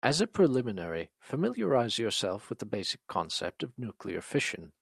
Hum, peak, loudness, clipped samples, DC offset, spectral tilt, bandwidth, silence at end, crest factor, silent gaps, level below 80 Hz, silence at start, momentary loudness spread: none; -8 dBFS; -32 LUFS; under 0.1%; under 0.1%; -4.5 dB/octave; 13.5 kHz; 0.1 s; 24 dB; none; -68 dBFS; 0.05 s; 12 LU